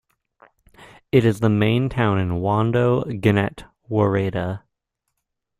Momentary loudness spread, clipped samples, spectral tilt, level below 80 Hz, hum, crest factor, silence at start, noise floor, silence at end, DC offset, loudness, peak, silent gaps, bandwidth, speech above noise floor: 8 LU; under 0.1%; -8 dB/octave; -48 dBFS; none; 18 dB; 0.8 s; -78 dBFS; 1 s; under 0.1%; -20 LUFS; -4 dBFS; none; 13 kHz; 59 dB